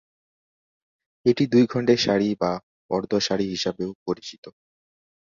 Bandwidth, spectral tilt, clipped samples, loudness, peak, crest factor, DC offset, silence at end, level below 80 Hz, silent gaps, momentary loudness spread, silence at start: 7.4 kHz; -5.5 dB/octave; under 0.1%; -23 LUFS; -4 dBFS; 20 dB; under 0.1%; 0.7 s; -60 dBFS; 2.63-2.89 s, 3.95-4.06 s, 4.38-4.43 s; 12 LU; 1.25 s